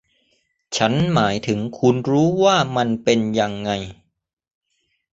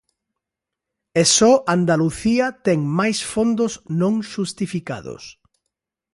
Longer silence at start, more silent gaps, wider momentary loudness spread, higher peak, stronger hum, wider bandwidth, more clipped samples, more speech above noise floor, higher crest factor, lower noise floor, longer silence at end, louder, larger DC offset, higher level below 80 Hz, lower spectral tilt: second, 0.7 s vs 1.15 s; neither; second, 9 LU vs 14 LU; about the same, -2 dBFS vs -2 dBFS; neither; second, 8 kHz vs 11.5 kHz; neither; second, 52 dB vs 66 dB; about the same, 20 dB vs 18 dB; second, -70 dBFS vs -85 dBFS; first, 1.2 s vs 0.85 s; about the same, -19 LUFS vs -19 LUFS; neither; about the same, -52 dBFS vs -52 dBFS; about the same, -5.5 dB/octave vs -4.5 dB/octave